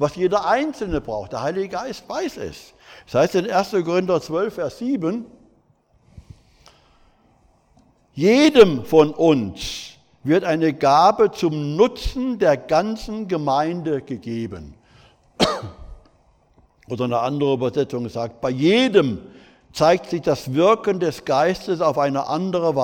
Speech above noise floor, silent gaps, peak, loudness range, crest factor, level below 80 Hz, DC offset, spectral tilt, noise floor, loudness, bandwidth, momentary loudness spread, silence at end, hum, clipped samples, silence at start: 40 dB; none; -2 dBFS; 9 LU; 20 dB; -44 dBFS; under 0.1%; -6 dB/octave; -60 dBFS; -20 LUFS; 17.5 kHz; 14 LU; 0 s; none; under 0.1%; 0 s